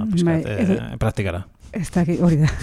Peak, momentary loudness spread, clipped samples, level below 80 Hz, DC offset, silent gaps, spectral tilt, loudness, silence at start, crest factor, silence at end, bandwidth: -6 dBFS; 12 LU; under 0.1%; -38 dBFS; under 0.1%; none; -7.5 dB/octave; -21 LUFS; 0 s; 12 dB; 0 s; 12.5 kHz